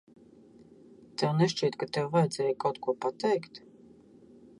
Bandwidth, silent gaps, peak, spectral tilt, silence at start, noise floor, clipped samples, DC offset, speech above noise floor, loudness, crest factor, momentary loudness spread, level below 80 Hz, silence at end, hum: 11.5 kHz; none; -12 dBFS; -6 dB/octave; 1.2 s; -56 dBFS; under 0.1%; under 0.1%; 27 dB; -30 LUFS; 18 dB; 9 LU; -74 dBFS; 1 s; none